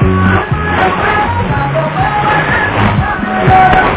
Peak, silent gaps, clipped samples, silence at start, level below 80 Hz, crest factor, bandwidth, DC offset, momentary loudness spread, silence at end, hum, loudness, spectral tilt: 0 dBFS; none; 0.5%; 0 s; -24 dBFS; 10 dB; 4 kHz; under 0.1%; 6 LU; 0 s; none; -11 LUFS; -10 dB/octave